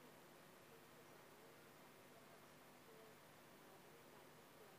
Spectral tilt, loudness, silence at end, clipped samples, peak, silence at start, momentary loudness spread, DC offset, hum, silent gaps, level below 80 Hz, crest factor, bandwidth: -3.5 dB/octave; -64 LUFS; 0 s; under 0.1%; -50 dBFS; 0 s; 1 LU; under 0.1%; none; none; under -90 dBFS; 14 dB; 15.5 kHz